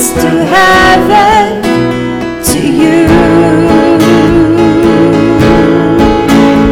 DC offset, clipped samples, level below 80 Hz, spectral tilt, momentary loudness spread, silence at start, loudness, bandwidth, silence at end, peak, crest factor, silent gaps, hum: under 0.1%; 2%; -24 dBFS; -5.5 dB/octave; 5 LU; 0 s; -6 LUFS; 17 kHz; 0 s; 0 dBFS; 6 dB; none; none